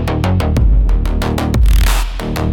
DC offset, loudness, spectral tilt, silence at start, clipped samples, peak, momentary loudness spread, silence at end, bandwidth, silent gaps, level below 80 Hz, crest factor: under 0.1%; -15 LUFS; -6 dB/octave; 0 s; under 0.1%; -2 dBFS; 6 LU; 0 s; 17 kHz; none; -14 dBFS; 10 dB